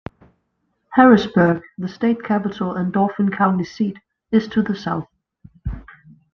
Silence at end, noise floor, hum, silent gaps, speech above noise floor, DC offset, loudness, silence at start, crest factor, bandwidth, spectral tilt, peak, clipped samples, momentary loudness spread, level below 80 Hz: 0.5 s; -70 dBFS; none; none; 53 dB; under 0.1%; -19 LUFS; 0.9 s; 18 dB; 6.6 kHz; -8 dB/octave; -2 dBFS; under 0.1%; 19 LU; -44 dBFS